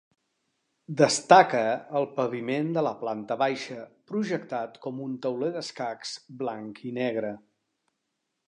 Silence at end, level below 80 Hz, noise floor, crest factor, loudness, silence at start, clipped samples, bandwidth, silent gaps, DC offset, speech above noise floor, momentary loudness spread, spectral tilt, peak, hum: 1.1 s; -78 dBFS; -81 dBFS; 24 dB; -27 LUFS; 0.9 s; under 0.1%; 11 kHz; none; under 0.1%; 54 dB; 17 LU; -4.5 dB/octave; -4 dBFS; none